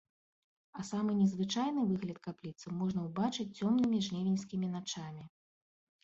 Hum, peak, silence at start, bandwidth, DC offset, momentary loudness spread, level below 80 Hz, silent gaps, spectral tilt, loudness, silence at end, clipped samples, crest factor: none; -20 dBFS; 0.75 s; 8 kHz; under 0.1%; 14 LU; -72 dBFS; none; -6 dB/octave; -35 LUFS; 0.75 s; under 0.1%; 16 dB